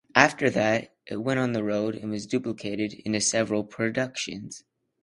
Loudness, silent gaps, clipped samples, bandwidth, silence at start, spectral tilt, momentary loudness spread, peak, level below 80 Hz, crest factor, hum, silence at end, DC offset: -26 LUFS; none; under 0.1%; 11.5 kHz; 0.15 s; -4 dB/octave; 12 LU; 0 dBFS; -62 dBFS; 26 dB; none; 0.45 s; under 0.1%